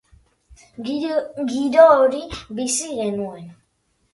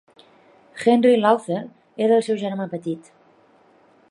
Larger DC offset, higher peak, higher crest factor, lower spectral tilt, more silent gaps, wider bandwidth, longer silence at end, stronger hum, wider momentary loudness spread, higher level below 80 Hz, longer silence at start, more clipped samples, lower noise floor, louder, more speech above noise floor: neither; about the same, 0 dBFS vs -2 dBFS; about the same, 20 dB vs 20 dB; second, -3.5 dB/octave vs -6 dB/octave; neither; about the same, 11.5 kHz vs 11.5 kHz; second, 0.6 s vs 1.1 s; neither; about the same, 19 LU vs 17 LU; first, -52 dBFS vs -74 dBFS; second, 0.5 s vs 0.75 s; neither; first, -67 dBFS vs -55 dBFS; about the same, -19 LUFS vs -20 LUFS; first, 48 dB vs 36 dB